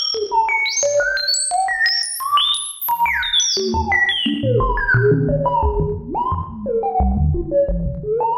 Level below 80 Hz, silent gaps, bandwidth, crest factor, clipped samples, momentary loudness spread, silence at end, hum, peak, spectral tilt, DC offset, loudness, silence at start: -28 dBFS; none; 16 kHz; 12 dB; under 0.1%; 7 LU; 0 s; none; -6 dBFS; -3.5 dB/octave; under 0.1%; -18 LUFS; 0 s